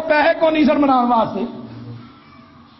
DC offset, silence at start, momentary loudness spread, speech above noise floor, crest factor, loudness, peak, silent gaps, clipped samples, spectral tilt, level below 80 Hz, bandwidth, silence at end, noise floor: under 0.1%; 0 s; 20 LU; 29 dB; 14 dB; -16 LUFS; -4 dBFS; none; under 0.1%; -8 dB/octave; -52 dBFS; 6 kHz; 0.7 s; -44 dBFS